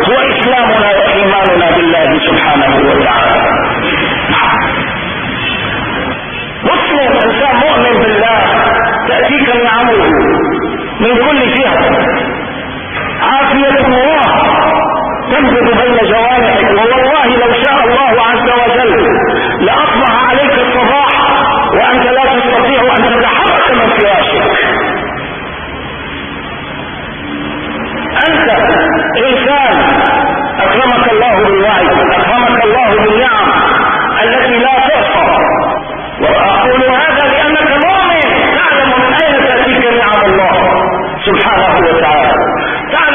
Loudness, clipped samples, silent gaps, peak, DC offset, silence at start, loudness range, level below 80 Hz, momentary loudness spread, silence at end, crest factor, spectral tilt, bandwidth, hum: -8 LUFS; under 0.1%; none; 0 dBFS; 0.3%; 0 s; 4 LU; -32 dBFS; 8 LU; 0 s; 10 dB; -8 dB/octave; 3.7 kHz; none